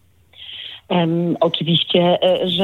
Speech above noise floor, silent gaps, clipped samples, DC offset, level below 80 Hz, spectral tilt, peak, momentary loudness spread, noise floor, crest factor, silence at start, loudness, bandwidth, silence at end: 25 dB; none; under 0.1%; under 0.1%; -64 dBFS; -7.5 dB/octave; -2 dBFS; 17 LU; -42 dBFS; 16 dB; 0.4 s; -17 LUFS; 4.4 kHz; 0 s